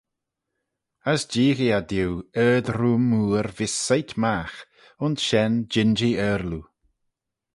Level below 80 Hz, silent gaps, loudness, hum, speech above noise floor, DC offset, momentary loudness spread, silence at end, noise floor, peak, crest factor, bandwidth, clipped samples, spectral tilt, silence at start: -50 dBFS; none; -23 LUFS; none; 60 dB; under 0.1%; 9 LU; 0.95 s; -83 dBFS; -6 dBFS; 18 dB; 11.5 kHz; under 0.1%; -5 dB/octave; 1.05 s